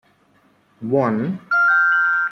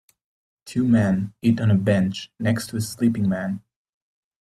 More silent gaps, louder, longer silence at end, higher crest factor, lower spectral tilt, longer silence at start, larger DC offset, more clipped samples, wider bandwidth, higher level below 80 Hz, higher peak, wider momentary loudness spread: neither; first, -17 LUFS vs -22 LUFS; second, 0 s vs 0.85 s; about the same, 14 dB vs 16 dB; about the same, -8 dB/octave vs -7 dB/octave; first, 0.8 s vs 0.65 s; neither; neither; second, 6.6 kHz vs 14 kHz; second, -66 dBFS vs -56 dBFS; about the same, -6 dBFS vs -6 dBFS; about the same, 9 LU vs 9 LU